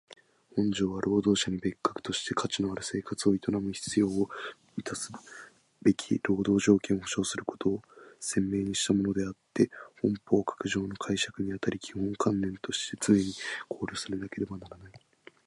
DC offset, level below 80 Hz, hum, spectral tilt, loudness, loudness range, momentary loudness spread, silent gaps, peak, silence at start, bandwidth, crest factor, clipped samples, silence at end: under 0.1%; -58 dBFS; none; -4.5 dB/octave; -30 LUFS; 2 LU; 11 LU; none; -10 dBFS; 0.55 s; 11.5 kHz; 20 dB; under 0.1%; 0.5 s